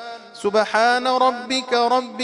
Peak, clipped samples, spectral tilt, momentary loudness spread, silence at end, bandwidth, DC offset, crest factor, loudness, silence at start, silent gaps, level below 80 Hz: -6 dBFS; under 0.1%; -2.5 dB/octave; 7 LU; 0 s; 11 kHz; under 0.1%; 14 dB; -19 LUFS; 0 s; none; -70 dBFS